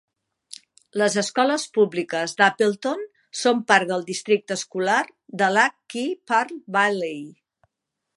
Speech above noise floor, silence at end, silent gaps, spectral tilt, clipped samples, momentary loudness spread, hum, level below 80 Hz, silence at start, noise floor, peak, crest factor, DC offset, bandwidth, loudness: 60 dB; 0.85 s; none; -3.5 dB/octave; under 0.1%; 15 LU; none; -78 dBFS; 0.95 s; -82 dBFS; -2 dBFS; 22 dB; under 0.1%; 11.5 kHz; -22 LUFS